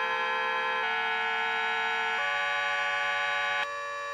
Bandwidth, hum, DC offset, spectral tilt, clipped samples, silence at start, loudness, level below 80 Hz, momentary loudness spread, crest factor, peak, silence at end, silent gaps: 13.5 kHz; none; under 0.1%; -0.5 dB/octave; under 0.1%; 0 s; -28 LUFS; -80 dBFS; 1 LU; 12 dB; -16 dBFS; 0 s; none